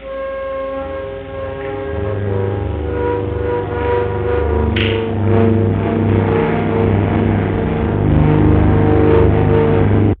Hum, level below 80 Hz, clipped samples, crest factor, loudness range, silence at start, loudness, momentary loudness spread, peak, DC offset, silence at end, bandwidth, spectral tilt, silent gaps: none; -24 dBFS; under 0.1%; 14 dB; 7 LU; 0 s; -16 LUFS; 11 LU; 0 dBFS; under 0.1%; 0.05 s; 4.1 kHz; -12 dB/octave; none